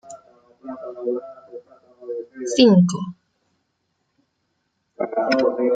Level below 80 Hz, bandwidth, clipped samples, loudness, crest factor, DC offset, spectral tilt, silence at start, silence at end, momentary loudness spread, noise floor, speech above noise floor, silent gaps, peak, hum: -66 dBFS; 9.2 kHz; under 0.1%; -20 LUFS; 20 dB; under 0.1%; -6 dB/octave; 0.05 s; 0 s; 27 LU; -72 dBFS; 54 dB; none; -2 dBFS; none